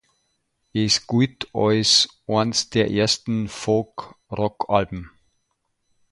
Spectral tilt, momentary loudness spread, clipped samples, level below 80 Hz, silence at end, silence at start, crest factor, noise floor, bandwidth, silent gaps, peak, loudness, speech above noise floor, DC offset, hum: -4 dB/octave; 14 LU; under 0.1%; -52 dBFS; 1.05 s; 0.75 s; 20 dB; -73 dBFS; 11.5 kHz; none; -4 dBFS; -21 LUFS; 52 dB; under 0.1%; none